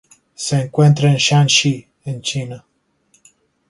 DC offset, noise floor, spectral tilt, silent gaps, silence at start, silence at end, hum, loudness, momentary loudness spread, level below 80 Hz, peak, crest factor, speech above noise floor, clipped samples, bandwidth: under 0.1%; -60 dBFS; -4.5 dB/octave; none; 0.4 s; 1.1 s; none; -15 LUFS; 16 LU; -56 dBFS; -2 dBFS; 16 dB; 45 dB; under 0.1%; 11.5 kHz